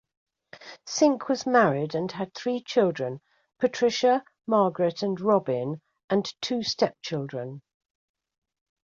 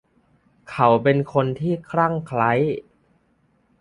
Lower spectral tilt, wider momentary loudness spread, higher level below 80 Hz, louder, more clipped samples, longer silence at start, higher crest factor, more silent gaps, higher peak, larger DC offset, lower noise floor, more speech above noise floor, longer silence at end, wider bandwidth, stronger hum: second, -5 dB/octave vs -8.5 dB/octave; first, 14 LU vs 8 LU; second, -70 dBFS vs -58 dBFS; second, -26 LUFS vs -21 LUFS; neither; second, 0.55 s vs 0.7 s; about the same, 20 dB vs 20 dB; first, 6.04-6.08 s vs none; second, -6 dBFS vs -2 dBFS; neither; second, -48 dBFS vs -63 dBFS; second, 23 dB vs 44 dB; first, 1.25 s vs 1 s; second, 7.6 kHz vs 11 kHz; neither